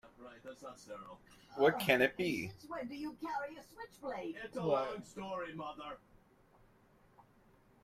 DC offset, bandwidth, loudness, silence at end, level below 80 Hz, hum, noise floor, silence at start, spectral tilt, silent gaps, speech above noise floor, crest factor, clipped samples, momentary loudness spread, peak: under 0.1%; 16 kHz; -37 LUFS; 1.85 s; -70 dBFS; none; -67 dBFS; 0.05 s; -5 dB/octave; none; 29 dB; 26 dB; under 0.1%; 22 LU; -14 dBFS